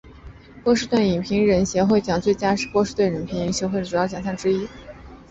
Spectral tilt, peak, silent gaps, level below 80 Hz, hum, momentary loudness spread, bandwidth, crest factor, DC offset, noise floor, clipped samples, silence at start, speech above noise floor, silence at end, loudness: -5.5 dB/octave; -6 dBFS; none; -46 dBFS; none; 7 LU; 8.2 kHz; 16 dB; under 0.1%; -43 dBFS; under 0.1%; 0.05 s; 22 dB; 0.1 s; -21 LUFS